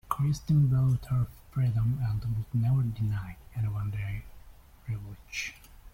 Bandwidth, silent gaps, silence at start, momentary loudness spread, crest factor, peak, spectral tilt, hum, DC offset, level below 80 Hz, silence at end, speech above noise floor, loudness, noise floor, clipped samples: 16 kHz; none; 0.05 s; 14 LU; 18 dB; -12 dBFS; -7 dB/octave; none; under 0.1%; -48 dBFS; 0.05 s; 23 dB; -30 LUFS; -52 dBFS; under 0.1%